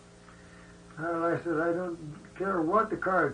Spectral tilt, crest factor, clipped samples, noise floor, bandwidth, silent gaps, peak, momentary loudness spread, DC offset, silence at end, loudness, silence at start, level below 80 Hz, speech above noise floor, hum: -7.5 dB/octave; 18 dB; under 0.1%; -52 dBFS; 10 kHz; none; -12 dBFS; 14 LU; under 0.1%; 0 s; -30 LUFS; 0.15 s; -60 dBFS; 23 dB; none